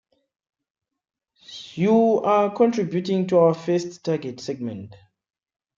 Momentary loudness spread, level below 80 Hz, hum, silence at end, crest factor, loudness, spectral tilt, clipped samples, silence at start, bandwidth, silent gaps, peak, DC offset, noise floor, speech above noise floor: 16 LU; -70 dBFS; none; 0.85 s; 18 dB; -21 LUFS; -7 dB/octave; under 0.1%; 1.5 s; 7.6 kHz; none; -6 dBFS; under 0.1%; -44 dBFS; 23 dB